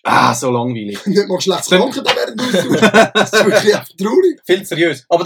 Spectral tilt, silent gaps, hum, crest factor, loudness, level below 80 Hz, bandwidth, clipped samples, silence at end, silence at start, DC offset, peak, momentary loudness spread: -4 dB/octave; none; none; 14 dB; -14 LUFS; -56 dBFS; 18.5 kHz; 0.1%; 0 s; 0.05 s; under 0.1%; 0 dBFS; 7 LU